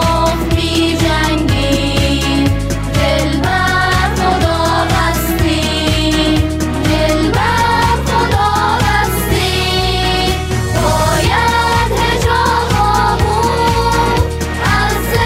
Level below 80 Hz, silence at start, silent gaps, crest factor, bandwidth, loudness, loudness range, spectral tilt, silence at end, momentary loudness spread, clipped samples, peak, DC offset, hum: -22 dBFS; 0 s; none; 12 dB; 16.5 kHz; -13 LUFS; 1 LU; -4.5 dB/octave; 0 s; 3 LU; under 0.1%; 0 dBFS; under 0.1%; none